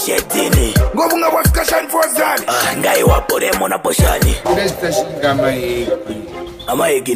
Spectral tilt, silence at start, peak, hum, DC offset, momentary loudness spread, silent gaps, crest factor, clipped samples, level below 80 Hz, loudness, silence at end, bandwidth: -4 dB/octave; 0 s; 0 dBFS; none; under 0.1%; 7 LU; none; 14 dB; under 0.1%; -24 dBFS; -15 LUFS; 0 s; 15.5 kHz